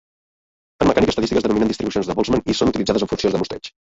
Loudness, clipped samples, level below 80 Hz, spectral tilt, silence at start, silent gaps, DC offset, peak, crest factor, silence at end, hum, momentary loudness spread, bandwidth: -19 LUFS; under 0.1%; -40 dBFS; -5.5 dB/octave; 0.8 s; none; under 0.1%; -2 dBFS; 18 dB; 0.2 s; none; 5 LU; 8 kHz